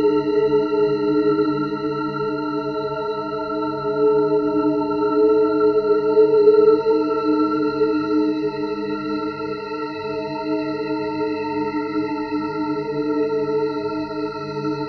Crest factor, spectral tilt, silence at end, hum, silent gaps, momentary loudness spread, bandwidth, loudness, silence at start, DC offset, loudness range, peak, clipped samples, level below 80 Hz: 16 dB; -8 dB/octave; 0 s; none; none; 9 LU; 6.2 kHz; -20 LUFS; 0 s; under 0.1%; 8 LU; -4 dBFS; under 0.1%; -54 dBFS